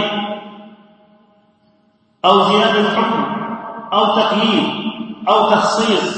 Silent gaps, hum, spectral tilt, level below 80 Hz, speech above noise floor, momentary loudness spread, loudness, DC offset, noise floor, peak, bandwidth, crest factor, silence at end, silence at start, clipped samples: none; none; -4.5 dB/octave; -62 dBFS; 44 dB; 13 LU; -15 LUFS; under 0.1%; -57 dBFS; 0 dBFS; 8.8 kHz; 16 dB; 0 s; 0 s; under 0.1%